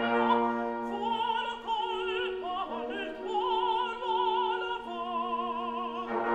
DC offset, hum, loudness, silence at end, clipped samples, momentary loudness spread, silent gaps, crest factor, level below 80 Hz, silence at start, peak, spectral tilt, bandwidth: under 0.1%; none; -31 LUFS; 0 s; under 0.1%; 7 LU; none; 18 dB; -64 dBFS; 0 s; -14 dBFS; -5 dB/octave; 8.8 kHz